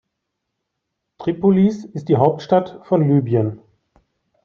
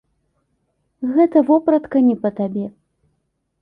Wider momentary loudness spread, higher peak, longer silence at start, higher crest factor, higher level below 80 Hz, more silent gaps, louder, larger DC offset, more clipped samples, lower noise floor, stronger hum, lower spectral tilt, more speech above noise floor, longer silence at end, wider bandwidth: second, 10 LU vs 13 LU; about the same, -4 dBFS vs -4 dBFS; first, 1.2 s vs 1 s; about the same, 16 dB vs 16 dB; about the same, -60 dBFS vs -62 dBFS; neither; about the same, -18 LUFS vs -17 LUFS; neither; neither; first, -78 dBFS vs -70 dBFS; neither; about the same, -9.5 dB/octave vs -10.5 dB/octave; first, 61 dB vs 54 dB; about the same, 0.9 s vs 0.9 s; first, 6.8 kHz vs 3.7 kHz